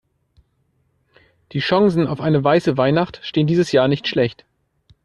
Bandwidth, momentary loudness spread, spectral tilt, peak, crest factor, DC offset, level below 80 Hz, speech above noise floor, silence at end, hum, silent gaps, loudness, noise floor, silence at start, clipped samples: 10 kHz; 6 LU; -7 dB/octave; -4 dBFS; 16 dB; under 0.1%; -54 dBFS; 48 dB; 0.7 s; none; none; -18 LUFS; -65 dBFS; 1.55 s; under 0.1%